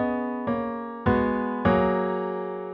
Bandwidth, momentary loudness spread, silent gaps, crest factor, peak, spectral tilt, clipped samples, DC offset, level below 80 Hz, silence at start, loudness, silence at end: 5.2 kHz; 8 LU; none; 18 dB; -8 dBFS; -6.5 dB/octave; under 0.1%; under 0.1%; -46 dBFS; 0 s; -26 LUFS; 0 s